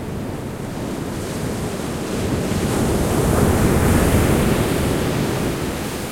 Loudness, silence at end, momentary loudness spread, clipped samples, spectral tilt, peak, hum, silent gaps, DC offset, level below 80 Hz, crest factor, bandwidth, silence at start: -20 LUFS; 0 s; 11 LU; under 0.1%; -5.5 dB/octave; -4 dBFS; none; none; under 0.1%; -30 dBFS; 16 dB; 16.5 kHz; 0 s